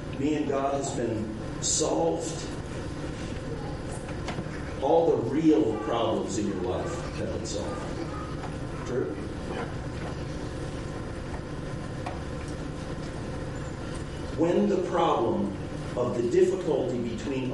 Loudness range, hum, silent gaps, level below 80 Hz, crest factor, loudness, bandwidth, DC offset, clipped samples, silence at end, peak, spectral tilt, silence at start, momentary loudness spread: 9 LU; none; none; -44 dBFS; 18 dB; -29 LUFS; 11.5 kHz; under 0.1%; under 0.1%; 0 s; -12 dBFS; -5.5 dB/octave; 0 s; 12 LU